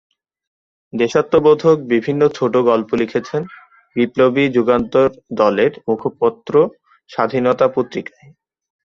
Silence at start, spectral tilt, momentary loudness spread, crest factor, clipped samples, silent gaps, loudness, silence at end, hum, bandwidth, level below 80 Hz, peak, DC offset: 0.95 s; -7 dB/octave; 11 LU; 16 dB; under 0.1%; none; -16 LUFS; 0.8 s; none; 7.2 kHz; -54 dBFS; -2 dBFS; under 0.1%